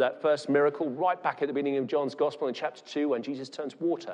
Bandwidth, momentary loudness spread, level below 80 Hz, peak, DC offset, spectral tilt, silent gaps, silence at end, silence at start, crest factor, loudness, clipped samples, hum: 10 kHz; 9 LU; -86 dBFS; -12 dBFS; under 0.1%; -6 dB/octave; none; 0 s; 0 s; 16 dB; -29 LUFS; under 0.1%; none